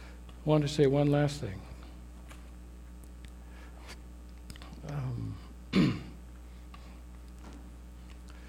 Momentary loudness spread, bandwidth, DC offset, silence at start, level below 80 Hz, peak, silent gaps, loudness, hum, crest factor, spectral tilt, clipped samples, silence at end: 23 LU; 14.5 kHz; under 0.1%; 0 s; -48 dBFS; -12 dBFS; none; -30 LUFS; none; 22 dB; -7 dB/octave; under 0.1%; 0 s